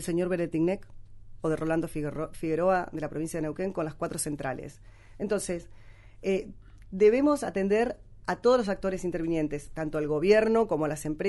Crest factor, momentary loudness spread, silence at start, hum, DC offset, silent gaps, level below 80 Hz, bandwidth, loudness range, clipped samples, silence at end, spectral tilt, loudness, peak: 18 dB; 12 LU; 0 s; none; under 0.1%; none; -50 dBFS; 11.5 kHz; 7 LU; under 0.1%; 0 s; -6 dB/octave; -28 LUFS; -10 dBFS